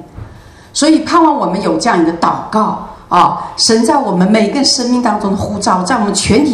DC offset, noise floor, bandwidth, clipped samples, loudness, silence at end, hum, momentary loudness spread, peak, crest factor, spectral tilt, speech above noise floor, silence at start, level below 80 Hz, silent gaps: under 0.1%; -36 dBFS; 12.5 kHz; 0.1%; -12 LUFS; 0 s; none; 5 LU; 0 dBFS; 12 dB; -4 dB/octave; 25 dB; 0 s; -40 dBFS; none